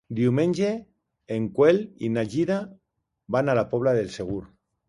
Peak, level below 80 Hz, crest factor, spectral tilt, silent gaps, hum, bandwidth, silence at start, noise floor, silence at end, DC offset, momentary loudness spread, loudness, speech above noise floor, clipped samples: -6 dBFS; -58 dBFS; 18 dB; -7.5 dB/octave; none; none; 11.5 kHz; 0.1 s; -66 dBFS; 0.45 s; under 0.1%; 12 LU; -25 LUFS; 43 dB; under 0.1%